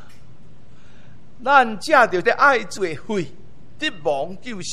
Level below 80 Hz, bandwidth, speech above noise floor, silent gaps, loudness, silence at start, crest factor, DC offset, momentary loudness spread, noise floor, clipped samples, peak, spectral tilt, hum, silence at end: -56 dBFS; 13.5 kHz; 29 dB; none; -19 LUFS; 1.4 s; 20 dB; 3%; 13 LU; -49 dBFS; under 0.1%; -2 dBFS; -4 dB/octave; none; 0 s